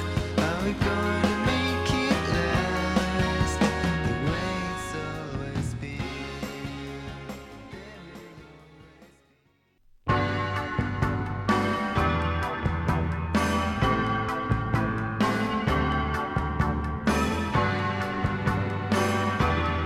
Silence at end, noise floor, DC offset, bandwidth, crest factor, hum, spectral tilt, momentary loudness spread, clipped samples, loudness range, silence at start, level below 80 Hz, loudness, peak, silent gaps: 0 s; -65 dBFS; under 0.1%; 15 kHz; 18 dB; none; -6 dB/octave; 11 LU; under 0.1%; 11 LU; 0 s; -38 dBFS; -27 LUFS; -10 dBFS; none